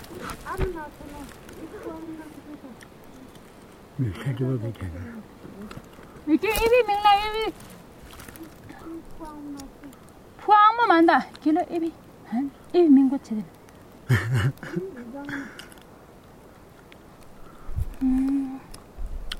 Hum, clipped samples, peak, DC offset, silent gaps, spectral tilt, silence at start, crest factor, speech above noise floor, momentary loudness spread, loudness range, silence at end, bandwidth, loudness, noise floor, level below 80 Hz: none; under 0.1%; -4 dBFS; under 0.1%; none; -6.5 dB/octave; 0 s; 22 dB; 25 dB; 26 LU; 15 LU; 0 s; 16 kHz; -23 LUFS; -49 dBFS; -42 dBFS